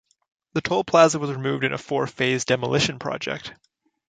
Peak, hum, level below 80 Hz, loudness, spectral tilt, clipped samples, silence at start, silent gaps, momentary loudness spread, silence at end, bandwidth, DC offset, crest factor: -4 dBFS; none; -58 dBFS; -23 LUFS; -4.5 dB/octave; under 0.1%; 0.55 s; none; 13 LU; 0.55 s; 9.6 kHz; under 0.1%; 20 dB